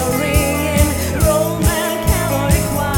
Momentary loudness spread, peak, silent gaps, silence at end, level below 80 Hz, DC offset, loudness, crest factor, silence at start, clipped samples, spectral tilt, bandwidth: 2 LU; 0 dBFS; none; 0 s; -22 dBFS; under 0.1%; -16 LUFS; 14 dB; 0 s; under 0.1%; -5 dB/octave; 19 kHz